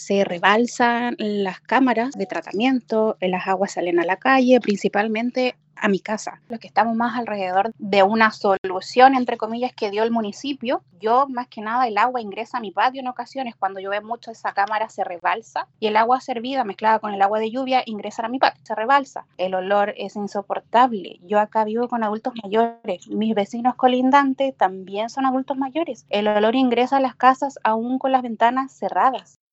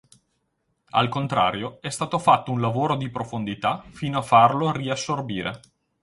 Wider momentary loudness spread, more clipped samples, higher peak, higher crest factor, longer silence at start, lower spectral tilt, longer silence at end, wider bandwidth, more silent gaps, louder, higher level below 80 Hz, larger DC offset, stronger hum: about the same, 10 LU vs 12 LU; neither; first, 0 dBFS vs -4 dBFS; about the same, 20 dB vs 20 dB; second, 0 s vs 0.95 s; about the same, -5 dB/octave vs -5.5 dB/octave; second, 0.3 s vs 0.45 s; second, 8.2 kHz vs 11.5 kHz; first, 8.58-8.64 s vs none; about the same, -21 LUFS vs -23 LUFS; second, -74 dBFS vs -56 dBFS; neither; neither